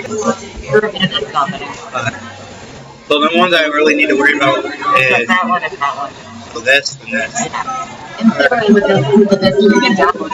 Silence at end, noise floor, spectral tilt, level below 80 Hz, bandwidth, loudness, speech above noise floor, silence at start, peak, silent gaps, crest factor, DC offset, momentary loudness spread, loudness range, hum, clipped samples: 0 s; -33 dBFS; -4.5 dB/octave; -46 dBFS; 12 kHz; -13 LUFS; 21 dB; 0 s; 0 dBFS; none; 14 dB; under 0.1%; 15 LU; 4 LU; none; under 0.1%